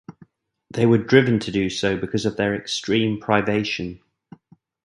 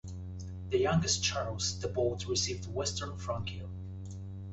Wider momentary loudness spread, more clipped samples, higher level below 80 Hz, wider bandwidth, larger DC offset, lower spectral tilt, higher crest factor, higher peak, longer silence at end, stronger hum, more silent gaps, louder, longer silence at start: second, 9 LU vs 15 LU; neither; about the same, -52 dBFS vs -48 dBFS; first, 11.5 kHz vs 8.2 kHz; neither; first, -5.5 dB/octave vs -4 dB/octave; about the same, 22 dB vs 18 dB; first, 0 dBFS vs -16 dBFS; first, 0.9 s vs 0 s; neither; neither; first, -21 LUFS vs -33 LUFS; about the same, 0.1 s vs 0.05 s